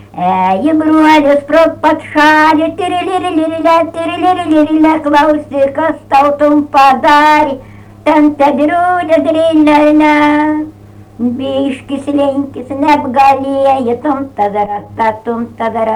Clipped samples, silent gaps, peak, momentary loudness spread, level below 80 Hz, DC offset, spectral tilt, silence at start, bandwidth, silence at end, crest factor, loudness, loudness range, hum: under 0.1%; none; 0 dBFS; 10 LU; -44 dBFS; under 0.1%; -5.5 dB/octave; 0.15 s; 11.5 kHz; 0 s; 10 dB; -10 LUFS; 3 LU; none